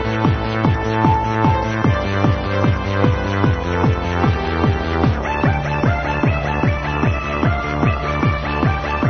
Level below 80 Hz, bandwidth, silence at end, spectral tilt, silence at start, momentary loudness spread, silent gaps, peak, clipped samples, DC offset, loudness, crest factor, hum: -26 dBFS; 6.6 kHz; 0 s; -7.5 dB/octave; 0 s; 2 LU; none; -2 dBFS; under 0.1%; under 0.1%; -18 LUFS; 16 dB; none